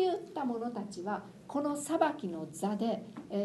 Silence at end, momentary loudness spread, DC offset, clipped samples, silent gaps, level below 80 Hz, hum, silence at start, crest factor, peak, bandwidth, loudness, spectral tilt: 0 s; 9 LU; under 0.1%; under 0.1%; none; -74 dBFS; none; 0 s; 20 dB; -14 dBFS; 12 kHz; -35 LUFS; -5.5 dB/octave